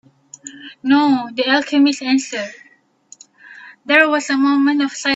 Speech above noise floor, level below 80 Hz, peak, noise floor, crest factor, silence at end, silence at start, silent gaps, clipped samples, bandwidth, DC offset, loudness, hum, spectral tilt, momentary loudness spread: 32 dB; -68 dBFS; 0 dBFS; -48 dBFS; 18 dB; 0 s; 0.45 s; none; under 0.1%; 8 kHz; under 0.1%; -16 LUFS; none; -2.5 dB/octave; 21 LU